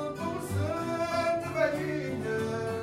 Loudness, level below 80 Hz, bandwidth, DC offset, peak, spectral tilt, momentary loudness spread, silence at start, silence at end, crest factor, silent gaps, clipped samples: -31 LUFS; -58 dBFS; 16 kHz; under 0.1%; -14 dBFS; -6 dB/octave; 4 LU; 0 s; 0 s; 16 dB; none; under 0.1%